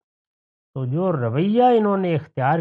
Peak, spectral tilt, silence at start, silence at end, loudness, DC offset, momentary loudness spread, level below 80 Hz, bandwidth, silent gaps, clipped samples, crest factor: -6 dBFS; -10 dB/octave; 0.75 s; 0 s; -20 LUFS; under 0.1%; 11 LU; -68 dBFS; 4.6 kHz; none; under 0.1%; 14 dB